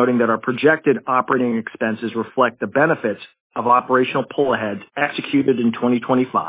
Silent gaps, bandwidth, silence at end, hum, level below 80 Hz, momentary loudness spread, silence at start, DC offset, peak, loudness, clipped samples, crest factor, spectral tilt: 3.40-3.50 s; 4 kHz; 0 s; none; -64 dBFS; 8 LU; 0 s; under 0.1%; -2 dBFS; -19 LUFS; under 0.1%; 16 dB; -10 dB/octave